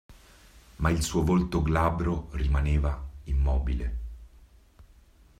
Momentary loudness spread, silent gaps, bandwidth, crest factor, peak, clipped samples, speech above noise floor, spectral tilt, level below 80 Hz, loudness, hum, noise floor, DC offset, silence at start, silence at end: 10 LU; none; 13.5 kHz; 18 dB; -10 dBFS; under 0.1%; 31 dB; -6.5 dB/octave; -32 dBFS; -28 LUFS; none; -56 dBFS; under 0.1%; 0.1 s; 0.55 s